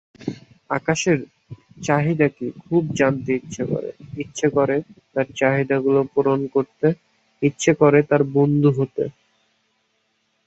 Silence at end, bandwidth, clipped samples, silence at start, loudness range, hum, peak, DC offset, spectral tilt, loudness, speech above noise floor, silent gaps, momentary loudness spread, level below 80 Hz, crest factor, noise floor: 1.35 s; 8.2 kHz; under 0.1%; 0.2 s; 3 LU; none; -2 dBFS; under 0.1%; -6.5 dB/octave; -20 LUFS; 49 dB; none; 14 LU; -58 dBFS; 18 dB; -68 dBFS